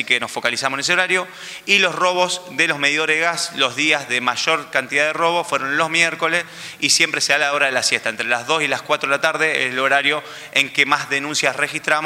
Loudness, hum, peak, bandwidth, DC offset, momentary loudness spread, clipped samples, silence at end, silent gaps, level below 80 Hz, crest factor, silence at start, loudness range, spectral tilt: -17 LUFS; none; -2 dBFS; 16 kHz; under 0.1%; 5 LU; under 0.1%; 0 s; none; -68 dBFS; 18 dB; 0 s; 1 LU; -1.5 dB/octave